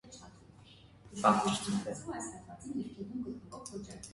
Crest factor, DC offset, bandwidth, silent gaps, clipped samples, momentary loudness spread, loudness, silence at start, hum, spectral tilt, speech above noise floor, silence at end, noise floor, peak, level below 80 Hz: 26 dB; under 0.1%; 11.5 kHz; none; under 0.1%; 20 LU; -35 LUFS; 0.05 s; none; -4.5 dB/octave; 22 dB; 0 s; -58 dBFS; -12 dBFS; -64 dBFS